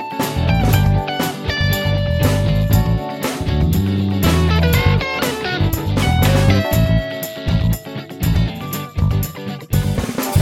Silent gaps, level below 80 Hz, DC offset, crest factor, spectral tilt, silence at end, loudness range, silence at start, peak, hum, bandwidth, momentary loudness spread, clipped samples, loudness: none; -24 dBFS; under 0.1%; 16 dB; -6 dB/octave; 0 s; 4 LU; 0 s; 0 dBFS; none; 17 kHz; 7 LU; under 0.1%; -17 LUFS